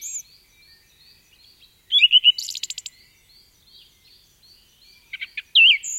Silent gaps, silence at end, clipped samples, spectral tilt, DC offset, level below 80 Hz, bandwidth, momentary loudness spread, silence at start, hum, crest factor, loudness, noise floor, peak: none; 0 s; under 0.1%; 5 dB/octave; under 0.1%; -68 dBFS; 16.5 kHz; 22 LU; 0 s; none; 20 dB; -15 LUFS; -55 dBFS; -4 dBFS